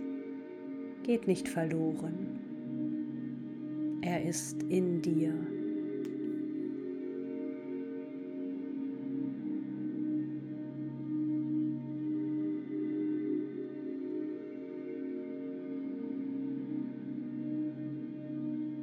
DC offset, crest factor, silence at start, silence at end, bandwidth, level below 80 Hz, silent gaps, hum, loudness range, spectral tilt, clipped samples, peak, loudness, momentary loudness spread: under 0.1%; 18 dB; 0 s; 0 s; 13.5 kHz; -80 dBFS; none; none; 5 LU; -6.5 dB/octave; under 0.1%; -18 dBFS; -37 LUFS; 8 LU